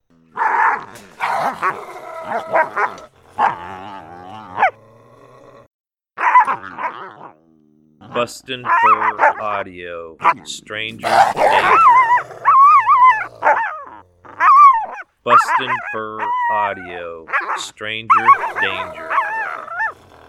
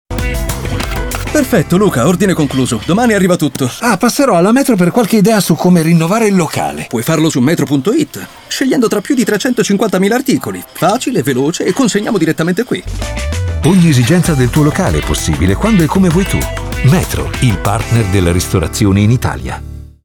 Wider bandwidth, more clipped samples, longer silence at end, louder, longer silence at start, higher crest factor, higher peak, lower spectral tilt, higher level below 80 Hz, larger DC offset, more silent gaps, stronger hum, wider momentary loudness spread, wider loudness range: second, 14 kHz vs 19.5 kHz; neither; first, 0.35 s vs 0.2 s; second, -15 LUFS vs -12 LUFS; first, 0.35 s vs 0.1 s; first, 16 dB vs 10 dB; about the same, 0 dBFS vs 0 dBFS; second, -3 dB/octave vs -5.5 dB/octave; second, -60 dBFS vs -26 dBFS; neither; first, 5.67-5.84 s vs none; neither; first, 20 LU vs 9 LU; first, 9 LU vs 3 LU